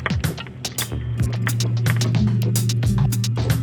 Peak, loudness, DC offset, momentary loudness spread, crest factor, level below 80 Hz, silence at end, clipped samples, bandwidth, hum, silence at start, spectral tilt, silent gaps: -4 dBFS; -21 LUFS; under 0.1%; 6 LU; 16 dB; -34 dBFS; 0 s; under 0.1%; over 20 kHz; none; 0 s; -5 dB/octave; none